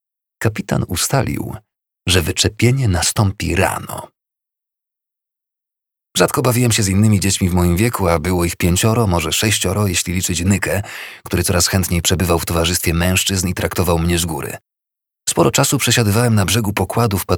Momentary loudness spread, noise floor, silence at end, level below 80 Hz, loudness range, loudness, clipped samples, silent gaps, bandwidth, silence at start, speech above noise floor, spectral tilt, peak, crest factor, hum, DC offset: 9 LU; -84 dBFS; 0 s; -34 dBFS; 4 LU; -16 LUFS; under 0.1%; none; 19.5 kHz; 0.4 s; 68 dB; -4 dB/octave; 0 dBFS; 18 dB; none; under 0.1%